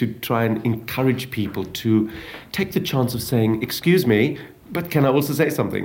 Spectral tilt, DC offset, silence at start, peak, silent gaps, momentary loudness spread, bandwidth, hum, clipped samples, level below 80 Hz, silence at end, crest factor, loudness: -6 dB/octave; under 0.1%; 0 s; -4 dBFS; none; 9 LU; 17 kHz; none; under 0.1%; -52 dBFS; 0 s; 16 dB; -21 LUFS